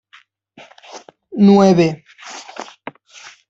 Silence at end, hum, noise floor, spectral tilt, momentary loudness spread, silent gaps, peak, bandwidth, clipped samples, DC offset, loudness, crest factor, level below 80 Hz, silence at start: 0.85 s; none; -51 dBFS; -7 dB/octave; 27 LU; none; -2 dBFS; 7.6 kHz; under 0.1%; under 0.1%; -12 LUFS; 16 dB; -60 dBFS; 0.95 s